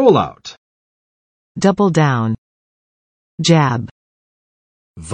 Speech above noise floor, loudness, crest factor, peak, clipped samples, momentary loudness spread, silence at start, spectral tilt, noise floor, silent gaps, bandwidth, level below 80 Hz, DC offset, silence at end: over 76 dB; -16 LUFS; 18 dB; 0 dBFS; under 0.1%; 22 LU; 0 s; -6 dB/octave; under -90 dBFS; 0.58-1.55 s, 2.38-3.38 s, 3.91-4.94 s; 10 kHz; -52 dBFS; under 0.1%; 0 s